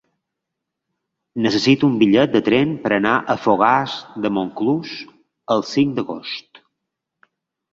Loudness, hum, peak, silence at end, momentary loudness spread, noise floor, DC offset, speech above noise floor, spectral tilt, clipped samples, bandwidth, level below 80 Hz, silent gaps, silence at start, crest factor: -18 LUFS; none; 0 dBFS; 1.35 s; 13 LU; -81 dBFS; under 0.1%; 63 dB; -6 dB/octave; under 0.1%; 7.6 kHz; -58 dBFS; none; 1.35 s; 20 dB